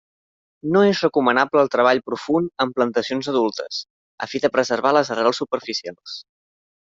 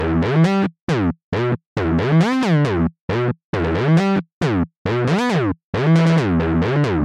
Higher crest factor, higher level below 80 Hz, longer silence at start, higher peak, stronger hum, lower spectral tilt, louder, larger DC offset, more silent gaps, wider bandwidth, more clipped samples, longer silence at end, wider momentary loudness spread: first, 18 dB vs 12 dB; second, -66 dBFS vs -38 dBFS; first, 0.65 s vs 0 s; about the same, -2 dBFS vs -4 dBFS; neither; second, -5 dB/octave vs -7.5 dB/octave; about the same, -20 LUFS vs -18 LUFS; neither; second, 3.90-4.18 s vs 0.81-0.87 s, 1.24-1.32 s, 1.66-1.76 s, 3.01-3.08 s, 3.44-3.53 s, 4.33-4.41 s, 4.77-4.85 s, 5.64-5.73 s; second, 7.8 kHz vs 9.2 kHz; neither; first, 0.75 s vs 0 s; first, 14 LU vs 6 LU